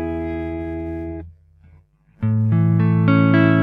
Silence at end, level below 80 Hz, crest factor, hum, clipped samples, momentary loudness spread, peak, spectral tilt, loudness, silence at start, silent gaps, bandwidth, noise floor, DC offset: 0 s; -42 dBFS; 16 dB; none; under 0.1%; 14 LU; -2 dBFS; -10.5 dB/octave; -19 LUFS; 0 s; none; 4.8 kHz; -52 dBFS; under 0.1%